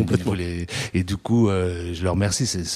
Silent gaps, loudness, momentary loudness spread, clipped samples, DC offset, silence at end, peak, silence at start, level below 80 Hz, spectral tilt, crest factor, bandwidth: none; -23 LUFS; 7 LU; under 0.1%; under 0.1%; 0 s; -4 dBFS; 0 s; -42 dBFS; -5 dB/octave; 18 dB; 14.5 kHz